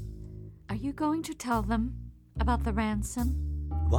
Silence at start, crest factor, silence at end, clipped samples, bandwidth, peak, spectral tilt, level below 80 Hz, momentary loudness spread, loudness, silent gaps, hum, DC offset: 0 s; 18 dB; 0 s; under 0.1%; 19.5 kHz; -12 dBFS; -6.5 dB/octave; -34 dBFS; 15 LU; -31 LUFS; none; none; under 0.1%